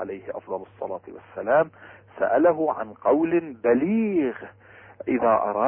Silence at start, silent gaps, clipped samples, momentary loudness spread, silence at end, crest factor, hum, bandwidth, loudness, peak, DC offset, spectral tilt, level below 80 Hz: 0 s; none; under 0.1%; 15 LU; 0 s; 16 dB; none; 3.3 kHz; -24 LUFS; -8 dBFS; under 0.1%; -11.5 dB/octave; -64 dBFS